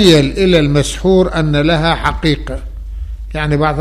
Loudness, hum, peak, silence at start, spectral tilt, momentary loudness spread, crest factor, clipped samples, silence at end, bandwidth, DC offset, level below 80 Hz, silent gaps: -13 LUFS; none; 0 dBFS; 0 s; -5.5 dB/octave; 16 LU; 12 dB; under 0.1%; 0 s; 14.5 kHz; 0.2%; -24 dBFS; none